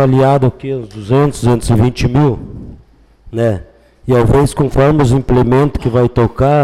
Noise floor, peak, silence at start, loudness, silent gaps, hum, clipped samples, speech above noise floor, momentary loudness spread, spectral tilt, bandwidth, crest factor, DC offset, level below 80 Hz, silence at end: -44 dBFS; -2 dBFS; 0 s; -12 LUFS; none; none; under 0.1%; 33 dB; 13 LU; -7.5 dB/octave; 13 kHz; 10 dB; under 0.1%; -28 dBFS; 0 s